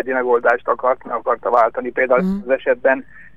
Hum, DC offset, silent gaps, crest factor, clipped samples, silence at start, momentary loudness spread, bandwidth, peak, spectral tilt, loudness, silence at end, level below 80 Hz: none; 0.8%; none; 16 dB; under 0.1%; 0 s; 5 LU; 5.6 kHz; -2 dBFS; -8.5 dB/octave; -18 LUFS; 0.35 s; -52 dBFS